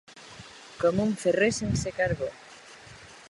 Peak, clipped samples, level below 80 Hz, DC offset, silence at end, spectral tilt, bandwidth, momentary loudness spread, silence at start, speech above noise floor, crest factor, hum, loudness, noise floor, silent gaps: -12 dBFS; under 0.1%; -50 dBFS; under 0.1%; 0.1 s; -5 dB/octave; 11.5 kHz; 22 LU; 0.1 s; 23 dB; 18 dB; none; -27 LUFS; -49 dBFS; none